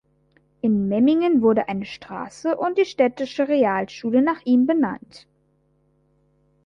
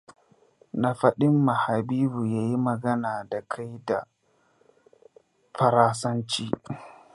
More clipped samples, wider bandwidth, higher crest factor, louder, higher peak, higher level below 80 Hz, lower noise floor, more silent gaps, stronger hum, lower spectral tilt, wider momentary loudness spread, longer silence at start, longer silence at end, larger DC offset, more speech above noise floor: neither; second, 7.4 kHz vs 11.5 kHz; about the same, 18 dB vs 22 dB; first, -21 LUFS vs -25 LUFS; about the same, -4 dBFS vs -4 dBFS; about the same, -62 dBFS vs -64 dBFS; about the same, -64 dBFS vs -65 dBFS; neither; neither; about the same, -7 dB/octave vs -6.5 dB/octave; about the same, 11 LU vs 13 LU; first, 0.65 s vs 0.1 s; first, 1.45 s vs 0.25 s; neither; about the same, 44 dB vs 41 dB